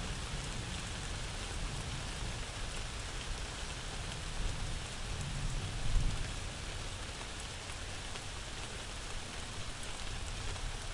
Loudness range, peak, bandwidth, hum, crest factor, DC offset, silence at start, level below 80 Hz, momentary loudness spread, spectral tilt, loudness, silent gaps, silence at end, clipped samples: 2 LU; -18 dBFS; 11.5 kHz; none; 20 dB; under 0.1%; 0 s; -42 dBFS; 3 LU; -3 dB/octave; -41 LUFS; none; 0 s; under 0.1%